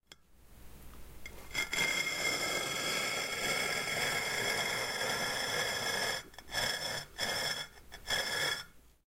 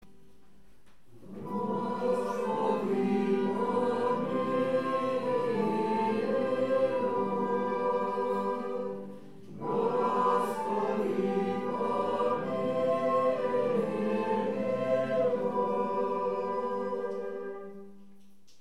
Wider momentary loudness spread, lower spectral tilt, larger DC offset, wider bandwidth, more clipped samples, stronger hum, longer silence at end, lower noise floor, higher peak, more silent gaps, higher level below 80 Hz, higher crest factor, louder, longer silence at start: about the same, 8 LU vs 8 LU; second, -1 dB/octave vs -7 dB/octave; second, under 0.1% vs 0.4%; first, 16 kHz vs 12.5 kHz; neither; neither; second, 0.25 s vs 0.55 s; second, -59 dBFS vs -63 dBFS; about the same, -18 dBFS vs -16 dBFS; neither; first, -58 dBFS vs -70 dBFS; about the same, 18 dB vs 14 dB; second, -33 LUFS vs -30 LUFS; second, 0.1 s vs 1.15 s